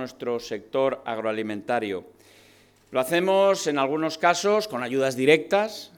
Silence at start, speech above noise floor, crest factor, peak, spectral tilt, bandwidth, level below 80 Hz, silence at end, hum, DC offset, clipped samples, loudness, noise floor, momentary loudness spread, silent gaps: 0 s; 32 dB; 20 dB; -4 dBFS; -4 dB/octave; 19 kHz; -70 dBFS; 0.1 s; none; under 0.1%; under 0.1%; -24 LUFS; -56 dBFS; 10 LU; none